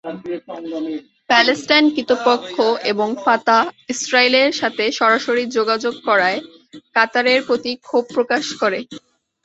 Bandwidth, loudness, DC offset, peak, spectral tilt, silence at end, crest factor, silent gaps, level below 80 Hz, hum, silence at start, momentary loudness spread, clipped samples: 8.2 kHz; -17 LUFS; under 0.1%; 0 dBFS; -2.5 dB/octave; 0.45 s; 18 dB; none; -66 dBFS; none; 0.05 s; 13 LU; under 0.1%